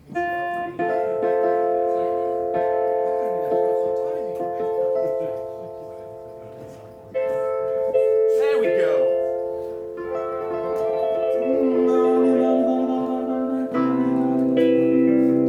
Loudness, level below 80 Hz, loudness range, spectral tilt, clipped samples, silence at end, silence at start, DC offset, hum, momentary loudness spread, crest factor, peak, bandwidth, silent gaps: -22 LUFS; -60 dBFS; 7 LU; -7.5 dB/octave; under 0.1%; 0 s; 0.05 s; under 0.1%; none; 13 LU; 14 dB; -8 dBFS; 9.8 kHz; none